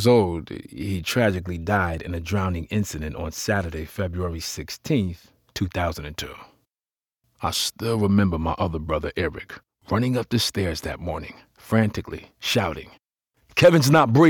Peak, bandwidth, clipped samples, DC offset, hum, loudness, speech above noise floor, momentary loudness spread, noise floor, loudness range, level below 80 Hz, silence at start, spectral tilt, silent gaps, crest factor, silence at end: -6 dBFS; 19.5 kHz; under 0.1%; under 0.1%; none; -24 LUFS; over 67 dB; 15 LU; under -90 dBFS; 5 LU; -42 dBFS; 0 s; -5.5 dB/octave; none; 18 dB; 0 s